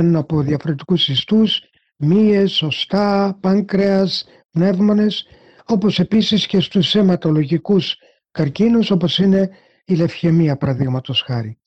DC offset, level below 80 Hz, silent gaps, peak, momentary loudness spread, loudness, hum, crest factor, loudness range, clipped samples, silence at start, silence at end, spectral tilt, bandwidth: under 0.1%; -52 dBFS; 4.45-4.49 s; -6 dBFS; 8 LU; -17 LUFS; none; 10 dB; 1 LU; under 0.1%; 0 s; 0.15 s; -7 dB/octave; 8 kHz